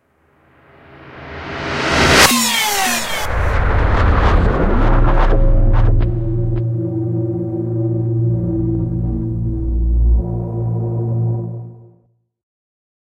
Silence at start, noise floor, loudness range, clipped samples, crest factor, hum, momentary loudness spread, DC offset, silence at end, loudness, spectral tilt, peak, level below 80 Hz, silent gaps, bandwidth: 1 s; -57 dBFS; 6 LU; under 0.1%; 16 dB; none; 8 LU; under 0.1%; 1.35 s; -17 LUFS; -4.5 dB/octave; 0 dBFS; -18 dBFS; none; 16 kHz